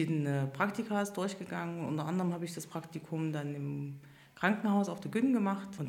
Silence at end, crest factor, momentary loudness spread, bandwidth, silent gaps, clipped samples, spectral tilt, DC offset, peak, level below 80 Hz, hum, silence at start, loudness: 0 s; 22 dB; 11 LU; 16.5 kHz; none; under 0.1%; -6.5 dB/octave; under 0.1%; -12 dBFS; -76 dBFS; none; 0 s; -34 LUFS